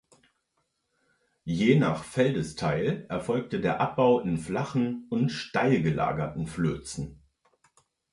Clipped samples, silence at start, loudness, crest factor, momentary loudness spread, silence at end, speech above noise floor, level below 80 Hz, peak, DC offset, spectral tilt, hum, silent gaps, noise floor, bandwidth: under 0.1%; 1.45 s; -27 LUFS; 20 dB; 10 LU; 1 s; 50 dB; -54 dBFS; -8 dBFS; under 0.1%; -6.5 dB/octave; none; none; -77 dBFS; 11.5 kHz